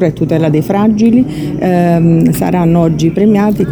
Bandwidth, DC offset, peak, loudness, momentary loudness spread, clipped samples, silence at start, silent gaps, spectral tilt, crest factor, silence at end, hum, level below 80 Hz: over 20 kHz; under 0.1%; 0 dBFS; -10 LUFS; 4 LU; under 0.1%; 0 s; none; -8 dB/octave; 10 dB; 0 s; none; -36 dBFS